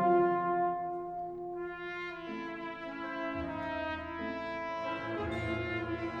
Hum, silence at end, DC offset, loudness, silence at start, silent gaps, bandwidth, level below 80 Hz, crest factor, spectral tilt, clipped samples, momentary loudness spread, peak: none; 0 s; under 0.1%; -36 LUFS; 0 s; none; 7.4 kHz; -58 dBFS; 16 dB; -7.5 dB/octave; under 0.1%; 10 LU; -18 dBFS